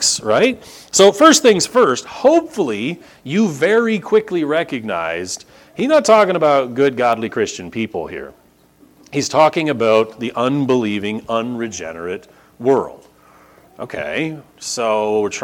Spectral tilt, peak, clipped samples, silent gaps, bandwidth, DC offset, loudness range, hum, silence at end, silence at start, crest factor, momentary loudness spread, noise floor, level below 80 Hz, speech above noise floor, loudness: -3.5 dB/octave; 0 dBFS; under 0.1%; none; 18 kHz; under 0.1%; 8 LU; none; 0 s; 0 s; 16 dB; 15 LU; -51 dBFS; -58 dBFS; 34 dB; -16 LUFS